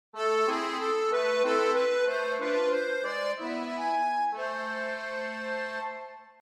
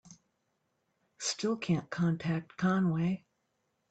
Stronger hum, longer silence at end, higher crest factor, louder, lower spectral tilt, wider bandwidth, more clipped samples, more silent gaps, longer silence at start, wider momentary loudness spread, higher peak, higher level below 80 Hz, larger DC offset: neither; second, 0.1 s vs 0.7 s; about the same, 14 dB vs 16 dB; first, -29 LUFS vs -32 LUFS; second, -2.5 dB/octave vs -5.5 dB/octave; first, 12.5 kHz vs 9 kHz; neither; neither; about the same, 0.15 s vs 0.1 s; about the same, 8 LU vs 6 LU; about the same, -16 dBFS vs -18 dBFS; second, -76 dBFS vs -70 dBFS; neither